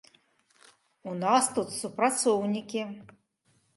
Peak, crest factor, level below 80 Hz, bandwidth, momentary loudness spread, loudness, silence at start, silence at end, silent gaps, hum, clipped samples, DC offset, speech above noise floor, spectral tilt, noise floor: -10 dBFS; 20 dB; -76 dBFS; 12 kHz; 15 LU; -28 LUFS; 1.05 s; 0.7 s; none; none; under 0.1%; under 0.1%; 42 dB; -3.5 dB/octave; -70 dBFS